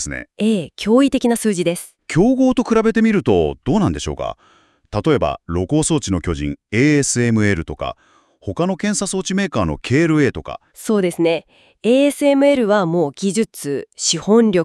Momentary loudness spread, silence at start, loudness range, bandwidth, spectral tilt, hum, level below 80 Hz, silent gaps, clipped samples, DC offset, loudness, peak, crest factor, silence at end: 11 LU; 0 s; 3 LU; 12 kHz; -5 dB/octave; none; -42 dBFS; none; under 0.1%; under 0.1%; -17 LUFS; -2 dBFS; 16 dB; 0 s